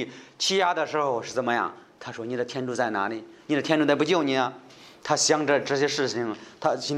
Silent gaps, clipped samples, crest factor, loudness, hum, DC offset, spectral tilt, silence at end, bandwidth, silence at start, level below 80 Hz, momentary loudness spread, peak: none; under 0.1%; 20 dB; -25 LUFS; none; under 0.1%; -3.5 dB/octave; 0 s; 13 kHz; 0 s; -74 dBFS; 13 LU; -6 dBFS